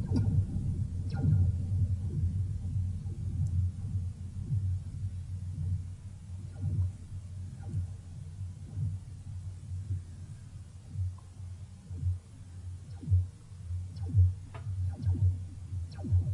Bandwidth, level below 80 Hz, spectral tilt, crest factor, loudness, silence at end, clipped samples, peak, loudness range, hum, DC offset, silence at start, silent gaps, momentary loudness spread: 10.5 kHz; -48 dBFS; -9 dB/octave; 18 dB; -35 LUFS; 0 s; under 0.1%; -16 dBFS; 8 LU; none; under 0.1%; 0 s; none; 16 LU